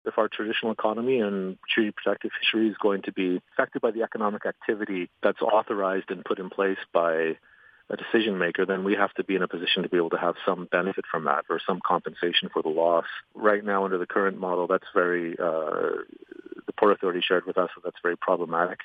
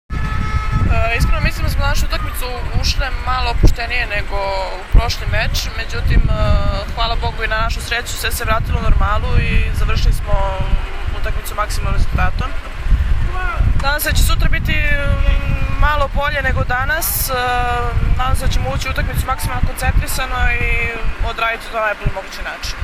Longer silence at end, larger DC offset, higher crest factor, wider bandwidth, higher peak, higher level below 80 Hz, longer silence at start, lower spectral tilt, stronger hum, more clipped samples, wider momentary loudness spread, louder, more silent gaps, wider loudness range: about the same, 0 s vs 0 s; neither; about the same, 20 dB vs 16 dB; second, 5 kHz vs 16 kHz; second, -6 dBFS vs 0 dBFS; second, -76 dBFS vs -18 dBFS; about the same, 0.05 s vs 0.1 s; first, -7.5 dB/octave vs -4.5 dB/octave; neither; neither; about the same, 7 LU vs 6 LU; second, -26 LUFS vs -19 LUFS; neither; about the same, 2 LU vs 2 LU